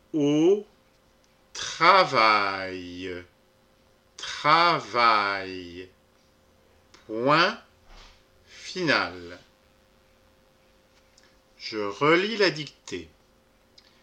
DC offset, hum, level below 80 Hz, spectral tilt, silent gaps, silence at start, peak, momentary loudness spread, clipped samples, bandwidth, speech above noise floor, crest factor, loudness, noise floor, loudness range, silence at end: under 0.1%; none; -64 dBFS; -4 dB/octave; none; 0.15 s; -4 dBFS; 20 LU; under 0.1%; 9.6 kHz; 38 dB; 24 dB; -23 LUFS; -62 dBFS; 9 LU; 1 s